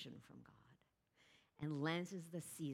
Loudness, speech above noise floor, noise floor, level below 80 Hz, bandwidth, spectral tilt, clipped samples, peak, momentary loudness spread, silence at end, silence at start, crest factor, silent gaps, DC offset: -46 LUFS; 31 dB; -78 dBFS; -82 dBFS; 16.5 kHz; -5.5 dB/octave; under 0.1%; -26 dBFS; 20 LU; 0 s; 0 s; 22 dB; none; under 0.1%